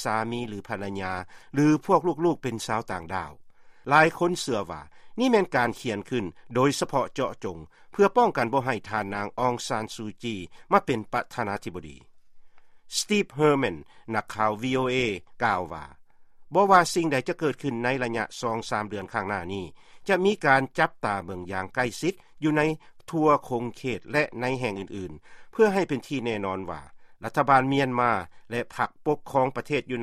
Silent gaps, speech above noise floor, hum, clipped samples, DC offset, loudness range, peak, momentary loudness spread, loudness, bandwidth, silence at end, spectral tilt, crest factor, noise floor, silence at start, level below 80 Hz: none; 22 dB; none; under 0.1%; under 0.1%; 3 LU; -4 dBFS; 14 LU; -26 LUFS; 14.5 kHz; 0 s; -5 dB/octave; 22 dB; -48 dBFS; 0 s; -58 dBFS